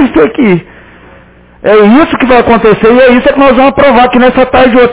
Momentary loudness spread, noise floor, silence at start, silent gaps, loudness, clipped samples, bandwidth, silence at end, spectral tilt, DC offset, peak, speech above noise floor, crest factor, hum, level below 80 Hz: 4 LU; -36 dBFS; 0 s; none; -5 LUFS; 8%; 4 kHz; 0 s; -10 dB/octave; under 0.1%; 0 dBFS; 32 dB; 6 dB; none; -30 dBFS